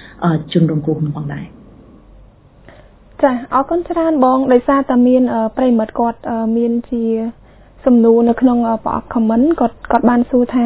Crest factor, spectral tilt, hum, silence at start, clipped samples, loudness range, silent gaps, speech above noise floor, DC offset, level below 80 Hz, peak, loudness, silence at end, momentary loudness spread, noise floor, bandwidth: 14 dB; -12 dB/octave; none; 0 s; under 0.1%; 6 LU; none; 30 dB; under 0.1%; -42 dBFS; 0 dBFS; -15 LUFS; 0 s; 9 LU; -43 dBFS; 4 kHz